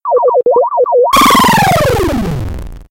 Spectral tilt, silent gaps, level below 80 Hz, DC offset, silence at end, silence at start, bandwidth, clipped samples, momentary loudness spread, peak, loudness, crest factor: -4.5 dB/octave; none; -26 dBFS; under 0.1%; 0.1 s; 0.05 s; 17 kHz; under 0.1%; 13 LU; 0 dBFS; -9 LUFS; 10 dB